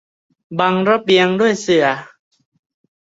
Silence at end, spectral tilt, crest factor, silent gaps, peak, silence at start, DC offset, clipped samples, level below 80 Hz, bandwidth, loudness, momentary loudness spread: 1.05 s; -5 dB/octave; 16 dB; none; -2 dBFS; 0.5 s; under 0.1%; under 0.1%; -60 dBFS; 8 kHz; -15 LUFS; 8 LU